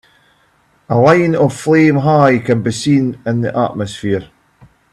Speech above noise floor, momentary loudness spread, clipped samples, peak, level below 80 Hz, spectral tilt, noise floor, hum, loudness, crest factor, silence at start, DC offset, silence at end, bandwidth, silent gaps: 42 dB; 9 LU; under 0.1%; 0 dBFS; -50 dBFS; -7 dB/octave; -55 dBFS; none; -13 LUFS; 14 dB; 0.9 s; under 0.1%; 0.7 s; 12.5 kHz; none